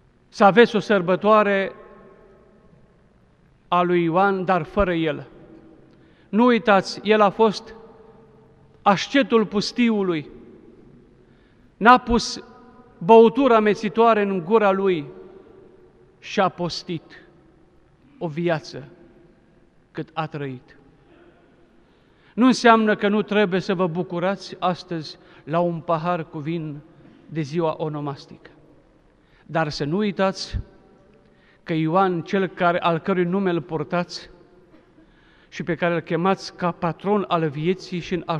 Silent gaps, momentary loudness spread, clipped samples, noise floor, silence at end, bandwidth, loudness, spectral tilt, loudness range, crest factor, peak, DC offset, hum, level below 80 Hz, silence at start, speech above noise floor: none; 17 LU; under 0.1%; -56 dBFS; 0 s; 10 kHz; -21 LUFS; -6 dB/octave; 12 LU; 22 dB; 0 dBFS; under 0.1%; none; -48 dBFS; 0.35 s; 36 dB